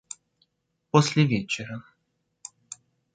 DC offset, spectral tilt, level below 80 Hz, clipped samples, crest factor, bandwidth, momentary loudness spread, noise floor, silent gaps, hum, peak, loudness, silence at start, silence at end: under 0.1%; -5.5 dB/octave; -64 dBFS; under 0.1%; 26 dB; 9.4 kHz; 23 LU; -76 dBFS; none; none; -2 dBFS; -24 LUFS; 0.95 s; 1.35 s